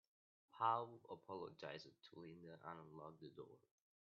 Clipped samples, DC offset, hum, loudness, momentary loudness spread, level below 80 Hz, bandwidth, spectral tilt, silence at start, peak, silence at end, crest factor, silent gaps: under 0.1%; under 0.1%; none; -50 LUFS; 19 LU; under -90 dBFS; 7 kHz; -4 dB/octave; 0.55 s; -26 dBFS; 0.6 s; 26 dB; none